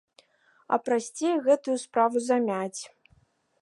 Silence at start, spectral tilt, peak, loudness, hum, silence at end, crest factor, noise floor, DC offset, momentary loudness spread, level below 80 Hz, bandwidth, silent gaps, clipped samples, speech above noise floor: 0.7 s; -4.5 dB/octave; -10 dBFS; -26 LUFS; none; 0.75 s; 18 dB; -65 dBFS; under 0.1%; 10 LU; -76 dBFS; 11.5 kHz; none; under 0.1%; 39 dB